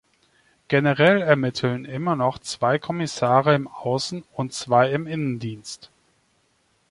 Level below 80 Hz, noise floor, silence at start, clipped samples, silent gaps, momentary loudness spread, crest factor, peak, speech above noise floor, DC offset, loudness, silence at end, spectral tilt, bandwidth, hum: -62 dBFS; -66 dBFS; 0.7 s; under 0.1%; none; 13 LU; 20 dB; -2 dBFS; 44 dB; under 0.1%; -22 LUFS; 1.15 s; -5.5 dB/octave; 11.5 kHz; none